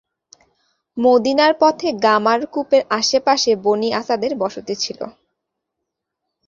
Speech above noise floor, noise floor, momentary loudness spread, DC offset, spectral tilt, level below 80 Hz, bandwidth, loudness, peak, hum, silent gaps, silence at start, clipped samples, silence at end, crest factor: 63 dB; -79 dBFS; 9 LU; under 0.1%; -3 dB/octave; -62 dBFS; 7.6 kHz; -17 LUFS; -2 dBFS; none; none; 0.95 s; under 0.1%; 1.4 s; 16 dB